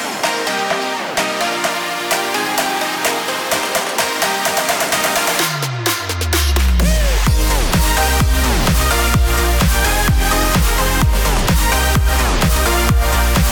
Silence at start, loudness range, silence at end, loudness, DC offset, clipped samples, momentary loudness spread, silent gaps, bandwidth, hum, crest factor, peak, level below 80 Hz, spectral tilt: 0 s; 3 LU; 0 s; -15 LUFS; under 0.1%; under 0.1%; 4 LU; none; 19.5 kHz; none; 10 dB; -4 dBFS; -18 dBFS; -3.5 dB/octave